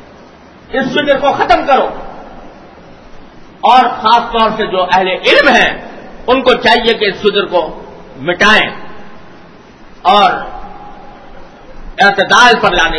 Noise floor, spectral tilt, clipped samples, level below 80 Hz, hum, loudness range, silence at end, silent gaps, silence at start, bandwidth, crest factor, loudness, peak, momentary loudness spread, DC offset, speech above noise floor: -37 dBFS; -3.5 dB/octave; 0.5%; -34 dBFS; none; 5 LU; 0 s; none; 0.7 s; 11 kHz; 12 dB; -10 LUFS; 0 dBFS; 20 LU; under 0.1%; 28 dB